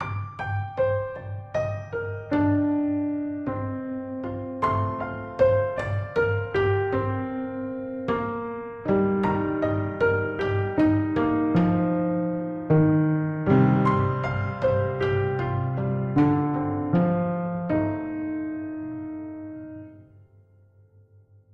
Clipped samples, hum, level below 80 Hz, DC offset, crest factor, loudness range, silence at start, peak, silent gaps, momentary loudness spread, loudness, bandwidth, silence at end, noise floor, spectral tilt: under 0.1%; none; -50 dBFS; under 0.1%; 16 dB; 5 LU; 0 s; -8 dBFS; none; 11 LU; -25 LUFS; 6.2 kHz; 1.5 s; -56 dBFS; -10 dB/octave